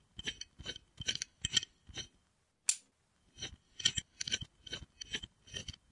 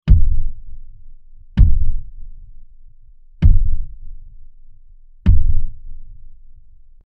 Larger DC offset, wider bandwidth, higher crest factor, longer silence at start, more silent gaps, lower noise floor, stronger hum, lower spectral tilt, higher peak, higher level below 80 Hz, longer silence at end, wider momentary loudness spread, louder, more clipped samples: neither; first, 11.5 kHz vs 3.1 kHz; first, 30 dB vs 14 dB; about the same, 0.15 s vs 0.05 s; neither; first, -76 dBFS vs -41 dBFS; neither; second, 0 dB/octave vs -10 dB/octave; second, -12 dBFS vs 0 dBFS; second, -62 dBFS vs -18 dBFS; second, 0.2 s vs 0.9 s; second, 13 LU vs 26 LU; second, -39 LUFS vs -20 LUFS; neither